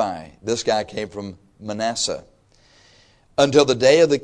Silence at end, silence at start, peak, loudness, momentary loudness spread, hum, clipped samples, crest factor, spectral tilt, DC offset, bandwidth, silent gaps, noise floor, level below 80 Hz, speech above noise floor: 0 s; 0 s; -2 dBFS; -20 LUFS; 18 LU; none; under 0.1%; 18 dB; -4 dB/octave; under 0.1%; 10.5 kHz; none; -55 dBFS; -54 dBFS; 36 dB